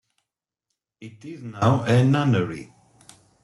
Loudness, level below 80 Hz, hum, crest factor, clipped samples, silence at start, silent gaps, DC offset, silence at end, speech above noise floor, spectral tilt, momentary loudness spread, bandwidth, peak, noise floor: -21 LUFS; -60 dBFS; none; 18 dB; under 0.1%; 1 s; none; under 0.1%; 0.8 s; 62 dB; -7.5 dB/octave; 20 LU; 11.5 kHz; -6 dBFS; -84 dBFS